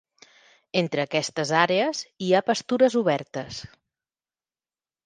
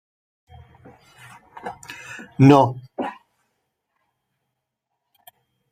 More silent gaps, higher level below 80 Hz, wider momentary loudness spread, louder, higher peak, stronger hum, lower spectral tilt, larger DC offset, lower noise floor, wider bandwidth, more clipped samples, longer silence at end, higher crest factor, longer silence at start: neither; about the same, -66 dBFS vs -62 dBFS; second, 13 LU vs 24 LU; second, -24 LUFS vs -17 LUFS; about the same, -4 dBFS vs -2 dBFS; neither; second, -4.5 dB/octave vs -8 dB/octave; neither; first, under -90 dBFS vs -80 dBFS; second, 9.8 kHz vs 14.5 kHz; neither; second, 1.45 s vs 2.6 s; about the same, 22 dB vs 22 dB; second, 0.75 s vs 1.65 s